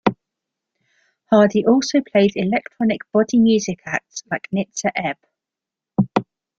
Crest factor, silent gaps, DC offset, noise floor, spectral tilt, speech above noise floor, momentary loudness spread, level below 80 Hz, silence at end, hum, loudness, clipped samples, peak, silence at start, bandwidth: 18 dB; none; under 0.1%; -87 dBFS; -5.5 dB/octave; 69 dB; 11 LU; -58 dBFS; 0.35 s; none; -19 LUFS; under 0.1%; -2 dBFS; 0.05 s; 7.8 kHz